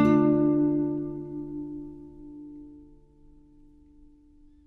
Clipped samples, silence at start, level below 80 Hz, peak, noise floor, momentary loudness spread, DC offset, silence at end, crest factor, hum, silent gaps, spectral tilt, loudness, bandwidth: under 0.1%; 0 s; -54 dBFS; -10 dBFS; -55 dBFS; 24 LU; under 0.1%; 1.8 s; 18 dB; none; none; -10 dB/octave; -26 LUFS; 4.1 kHz